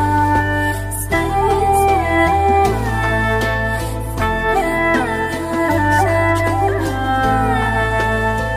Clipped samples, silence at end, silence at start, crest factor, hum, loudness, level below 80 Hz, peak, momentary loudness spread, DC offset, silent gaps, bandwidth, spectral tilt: under 0.1%; 0 s; 0 s; 14 dB; none; -16 LUFS; -28 dBFS; -2 dBFS; 5 LU; under 0.1%; none; 15.5 kHz; -5.5 dB/octave